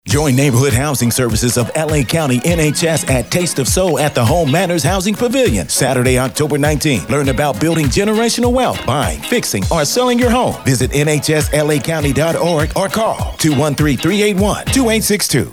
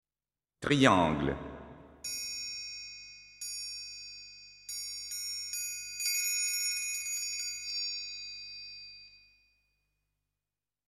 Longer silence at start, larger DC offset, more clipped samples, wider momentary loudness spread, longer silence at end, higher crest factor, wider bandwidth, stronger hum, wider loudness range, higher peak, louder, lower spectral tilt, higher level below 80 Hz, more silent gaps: second, 0.05 s vs 0.6 s; first, 0.3% vs under 0.1%; neither; second, 3 LU vs 19 LU; second, 0 s vs 1.7 s; second, 12 dB vs 30 dB; first, 19 kHz vs 16 kHz; second, none vs 50 Hz at -70 dBFS; second, 1 LU vs 8 LU; first, -2 dBFS vs -6 dBFS; first, -14 LUFS vs -33 LUFS; first, -4.5 dB/octave vs -2.5 dB/octave; first, -30 dBFS vs -60 dBFS; neither